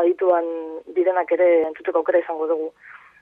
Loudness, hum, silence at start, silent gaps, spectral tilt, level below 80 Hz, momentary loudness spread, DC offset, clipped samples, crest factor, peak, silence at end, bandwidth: -21 LUFS; none; 0 s; none; -7 dB/octave; -72 dBFS; 10 LU; under 0.1%; under 0.1%; 14 dB; -8 dBFS; 0.25 s; 3.7 kHz